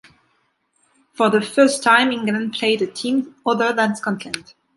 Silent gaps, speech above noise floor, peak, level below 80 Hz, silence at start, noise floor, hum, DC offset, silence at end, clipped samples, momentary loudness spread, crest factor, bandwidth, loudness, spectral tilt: none; 47 dB; -2 dBFS; -68 dBFS; 1.2 s; -66 dBFS; none; under 0.1%; 0.35 s; under 0.1%; 10 LU; 18 dB; 11.5 kHz; -18 LUFS; -4 dB/octave